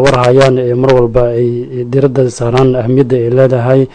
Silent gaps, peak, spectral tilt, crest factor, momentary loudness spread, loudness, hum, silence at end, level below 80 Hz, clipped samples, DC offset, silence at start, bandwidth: none; 0 dBFS; -7.5 dB/octave; 10 dB; 6 LU; -10 LUFS; none; 0.05 s; -30 dBFS; 2%; under 0.1%; 0 s; 9.4 kHz